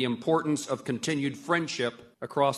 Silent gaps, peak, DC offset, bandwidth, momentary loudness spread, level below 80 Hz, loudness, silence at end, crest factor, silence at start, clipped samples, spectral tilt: none; -10 dBFS; under 0.1%; 13.5 kHz; 7 LU; -72 dBFS; -29 LUFS; 0 s; 18 dB; 0 s; under 0.1%; -4.5 dB/octave